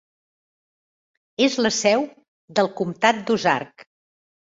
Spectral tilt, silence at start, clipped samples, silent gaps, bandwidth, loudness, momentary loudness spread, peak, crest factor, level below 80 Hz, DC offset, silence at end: -3.5 dB/octave; 1.4 s; under 0.1%; 2.28-2.48 s; 8 kHz; -21 LUFS; 11 LU; -2 dBFS; 22 dB; -66 dBFS; under 0.1%; 0.75 s